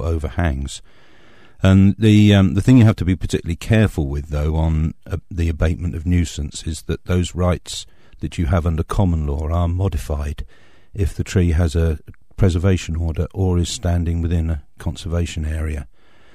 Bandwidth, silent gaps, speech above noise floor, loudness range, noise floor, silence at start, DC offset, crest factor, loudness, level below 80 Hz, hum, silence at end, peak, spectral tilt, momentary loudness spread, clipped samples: 12.5 kHz; none; 30 dB; 7 LU; -48 dBFS; 0 s; 0.8%; 16 dB; -19 LUFS; -28 dBFS; none; 0.5 s; -2 dBFS; -7 dB/octave; 15 LU; under 0.1%